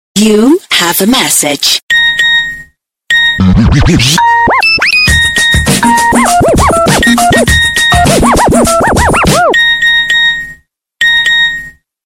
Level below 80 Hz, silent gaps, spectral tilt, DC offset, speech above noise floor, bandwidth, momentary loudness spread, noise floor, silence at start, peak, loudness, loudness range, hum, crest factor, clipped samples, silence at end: -22 dBFS; 1.82-1.88 s; -3.5 dB/octave; under 0.1%; 31 dB; 17 kHz; 3 LU; -38 dBFS; 0.15 s; 0 dBFS; -6 LUFS; 1 LU; none; 8 dB; under 0.1%; 0.35 s